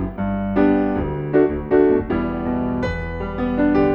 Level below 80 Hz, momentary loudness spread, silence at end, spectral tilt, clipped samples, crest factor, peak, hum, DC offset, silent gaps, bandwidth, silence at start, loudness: -34 dBFS; 7 LU; 0 s; -9.5 dB/octave; under 0.1%; 14 dB; -4 dBFS; none; under 0.1%; none; 6.6 kHz; 0 s; -20 LUFS